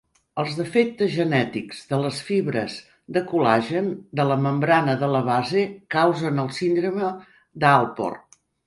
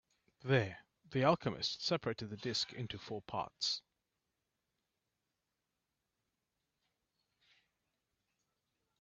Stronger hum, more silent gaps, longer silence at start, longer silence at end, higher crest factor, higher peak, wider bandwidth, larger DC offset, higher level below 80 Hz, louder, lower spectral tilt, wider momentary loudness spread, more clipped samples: neither; neither; about the same, 0.35 s vs 0.45 s; second, 0.45 s vs 5.2 s; second, 20 dB vs 26 dB; first, -2 dBFS vs -16 dBFS; first, 11.5 kHz vs 8 kHz; neither; first, -64 dBFS vs -74 dBFS; first, -22 LUFS vs -37 LUFS; first, -6.5 dB/octave vs -5 dB/octave; about the same, 10 LU vs 12 LU; neither